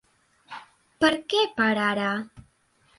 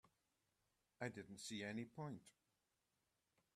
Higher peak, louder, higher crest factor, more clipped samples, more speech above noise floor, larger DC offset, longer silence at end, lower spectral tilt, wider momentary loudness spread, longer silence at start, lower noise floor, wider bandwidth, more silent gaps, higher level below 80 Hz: first, -6 dBFS vs -30 dBFS; first, -24 LUFS vs -52 LUFS; about the same, 22 dB vs 24 dB; neither; about the same, 40 dB vs 37 dB; neither; second, 0.55 s vs 1.25 s; about the same, -4.5 dB/octave vs -4.5 dB/octave; first, 21 LU vs 5 LU; first, 0.5 s vs 0.05 s; second, -64 dBFS vs -89 dBFS; second, 11.5 kHz vs 13.5 kHz; neither; first, -62 dBFS vs -88 dBFS